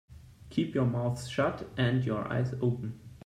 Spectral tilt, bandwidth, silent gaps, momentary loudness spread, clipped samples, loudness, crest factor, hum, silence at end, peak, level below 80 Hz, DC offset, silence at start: -7 dB/octave; 11 kHz; none; 5 LU; under 0.1%; -31 LUFS; 16 dB; none; 0.05 s; -14 dBFS; -58 dBFS; under 0.1%; 0.1 s